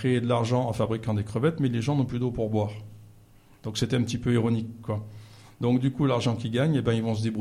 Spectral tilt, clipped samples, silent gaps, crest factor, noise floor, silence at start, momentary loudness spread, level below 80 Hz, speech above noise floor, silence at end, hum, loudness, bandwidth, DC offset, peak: -7 dB/octave; under 0.1%; none; 16 dB; -54 dBFS; 0 s; 9 LU; -52 dBFS; 28 dB; 0 s; none; -27 LUFS; 12 kHz; under 0.1%; -10 dBFS